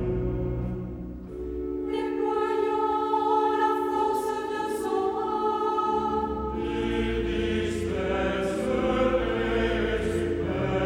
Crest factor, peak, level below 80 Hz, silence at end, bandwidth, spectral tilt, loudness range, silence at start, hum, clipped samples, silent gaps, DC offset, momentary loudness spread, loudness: 16 dB; -12 dBFS; -40 dBFS; 0 s; 16.5 kHz; -6.5 dB/octave; 2 LU; 0 s; none; under 0.1%; none; under 0.1%; 7 LU; -27 LUFS